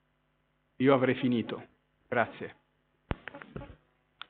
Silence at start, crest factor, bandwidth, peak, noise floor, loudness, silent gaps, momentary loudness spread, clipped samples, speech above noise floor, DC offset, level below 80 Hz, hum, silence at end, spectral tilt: 0.8 s; 26 dB; 4.4 kHz; -8 dBFS; -74 dBFS; -30 LUFS; none; 20 LU; under 0.1%; 46 dB; under 0.1%; -54 dBFS; none; 0.55 s; -5 dB/octave